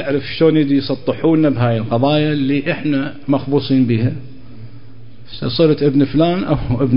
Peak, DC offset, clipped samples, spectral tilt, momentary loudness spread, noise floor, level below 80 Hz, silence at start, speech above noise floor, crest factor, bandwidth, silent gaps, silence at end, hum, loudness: -2 dBFS; 3%; under 0.1%; -12.5 dB/octave; 7 LU; -40 dBFS; -40 dBFS; 0 s; 25 dB; 14 dB; 5.4 kHz; none; 0 s; none; -16 LUFS